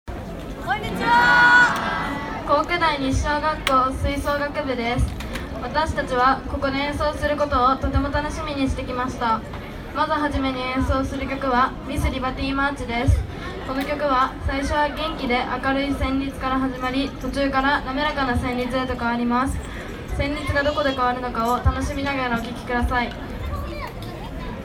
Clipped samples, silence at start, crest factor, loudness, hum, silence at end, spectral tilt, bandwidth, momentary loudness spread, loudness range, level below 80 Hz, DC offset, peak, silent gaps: under 0.1%; 0.05 s; 20 dB; -22 LUFS; none; 0 s; -5.5 dB/octave; 16 kHz; 11 LU; 5 LU; -32 dBFS; under 0.1%; -2 dBFS; none